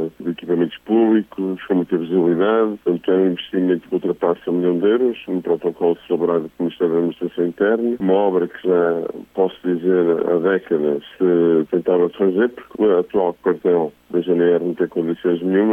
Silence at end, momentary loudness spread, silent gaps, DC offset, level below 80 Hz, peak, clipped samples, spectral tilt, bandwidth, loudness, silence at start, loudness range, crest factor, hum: 0 s; 5 LU; none; under 0.1%; -62 dBFS; -6 dBFS; under 0.1%; -9 dB/octave; 3.7 kHz; -19 LUFS; 0 s; 2 LU; 12 dB; none